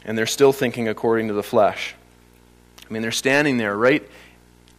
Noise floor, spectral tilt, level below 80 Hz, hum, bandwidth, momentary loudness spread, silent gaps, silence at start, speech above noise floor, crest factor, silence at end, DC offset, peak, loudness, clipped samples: -52 dBFS; -4 dB/octave; -56 dBFS; 60 Hz at -50 dBFS; 15.5 kHz; 10 LU; none; 0.05 s; 32 dB; 18 dB; 0.6 s; under 0.1%; -4 dBFS; -20 LUFS; under 0.1%